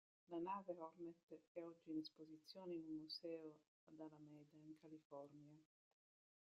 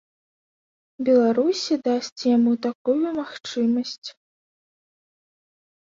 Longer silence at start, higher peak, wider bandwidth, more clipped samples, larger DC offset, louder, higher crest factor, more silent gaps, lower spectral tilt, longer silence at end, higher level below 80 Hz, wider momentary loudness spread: second, 0.3 s vs 1 s; second, -38 dBFS vs -8 dBFS; about the same, 7.6 kHz vs 7.6 kHz; neither; neither; second, -56 LUFS vs -22 LUFS; about the same, 18 dB vs 16 dB; first, 1.23-1.28 s, 1.47-1.55 s, 3.68-3.87 s, 5.05-5.10 s vs 2.12-2.16 s, 2.75-2.85 s, 3.98-4.02 s; about the same, -4.5 dB/octave vs -5 dB/octave; second, 0.9 s vs 1.85 s; second, under -90 dBFS vs -70 dBFS; about the same, 14 LU vs 12 LU